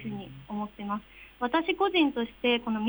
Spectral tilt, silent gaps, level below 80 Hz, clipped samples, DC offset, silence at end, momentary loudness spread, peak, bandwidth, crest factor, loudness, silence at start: -7 dB/octave; none; -60 dBFS; under 0.1%; under 0.1%; 0 s; 13 LU; -12 dBFS; over 20 kHz; 16 dB; -29 LUFS; 0 s